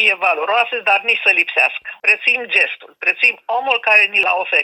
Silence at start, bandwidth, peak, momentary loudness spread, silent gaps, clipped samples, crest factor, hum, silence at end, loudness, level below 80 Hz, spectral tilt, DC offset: 0 s; 14 kHz; -2 dBFS; 7 LU; none; under 0.1%; 16 dB; none; 0 s; -14 LUFS; -74 dBFS; -0.5 dB/octave; under 0.1%